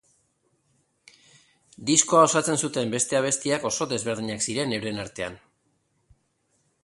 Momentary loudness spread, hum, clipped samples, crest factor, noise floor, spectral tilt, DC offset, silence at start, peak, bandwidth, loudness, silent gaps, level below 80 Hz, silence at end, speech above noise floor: 14 LU; none; under 0.1%; 24 dB; -71 dBFS; -3 dB/octave; under 0.1%; 1.8 s; -4 dBFS; 11.5 kHz; -24 LUFS; none; -62 dBFS; 1.45 s; 46 dB